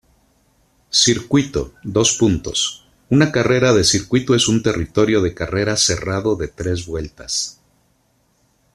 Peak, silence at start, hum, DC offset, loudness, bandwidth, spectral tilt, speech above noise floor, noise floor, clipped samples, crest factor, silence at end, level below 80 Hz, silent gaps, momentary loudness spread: -2 dBFS; 0.95 s; none; under 0.1%; -17 LUFS; 13.5 kHz; -4 dB/octave; 44 dB; -61 dBFS; under 0.1%; 18 dB; 1.2 s; -42 dBFS; none; 9 LU